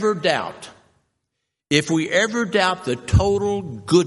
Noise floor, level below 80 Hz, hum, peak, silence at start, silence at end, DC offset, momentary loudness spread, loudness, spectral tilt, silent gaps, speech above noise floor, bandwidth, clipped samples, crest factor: -79 dBFS; -40 dBFS; none; -2 dBFS; 0 s; 0 s; under 0.1%; 8 LU; -20 LUFS; -5 dB/octave; none; 59 dB; 11.5 kHz; under 0.1%; 18 dB